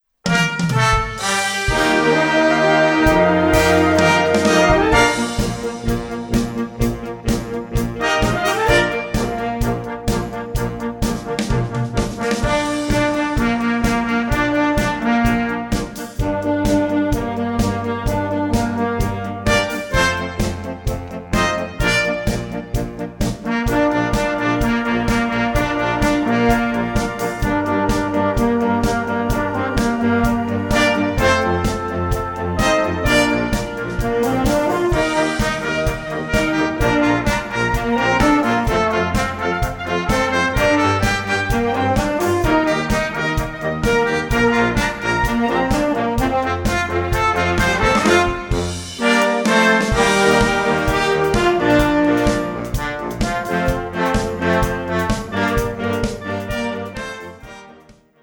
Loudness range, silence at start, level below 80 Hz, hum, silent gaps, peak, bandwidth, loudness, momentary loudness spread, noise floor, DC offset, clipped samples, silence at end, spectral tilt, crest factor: 5 LU; 0.25 s; -30 dBFS; none; none; 0 dBFS; 19.5 kHz; -18 LUFS; 9 LU; -47 dBFS; under 0.1%; under 0.1%; 0.3 s; -5 dB/octave; 18 dB